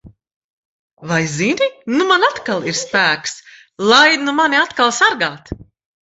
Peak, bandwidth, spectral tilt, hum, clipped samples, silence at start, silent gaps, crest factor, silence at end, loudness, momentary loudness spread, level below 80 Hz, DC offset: 0 dBFS; 8.4 kHz; -3 dB/octave; none; under 0.1%; 0.05 s; 0.36-0.97 s; 16 dB; 0.4 s; -15 LUFS; 18 LU; -50 dBFS; under 0.1%